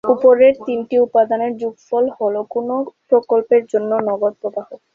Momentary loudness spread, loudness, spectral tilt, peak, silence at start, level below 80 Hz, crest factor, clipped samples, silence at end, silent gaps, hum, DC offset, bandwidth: 11 LU; -17 LUFS; -7 dB/octave; -2 dBFS; 0.05 s; -62 dBFS; 14 dB; under 0.1%; 0.2 s; none; none; under 0.1%; 6.8 kHz